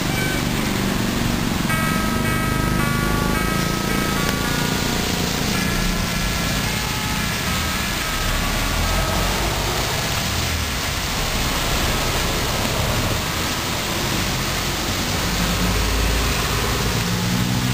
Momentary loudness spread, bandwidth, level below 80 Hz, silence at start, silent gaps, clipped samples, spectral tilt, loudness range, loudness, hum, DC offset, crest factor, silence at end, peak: 2 LU; 16 kHz; -28 dBFS; 0 s; none; under 0.1%; -3.5 dB/octave; 1 LU; -20 LUFS; none; 0.4%; 20 dB; 0 s; 0 dBFS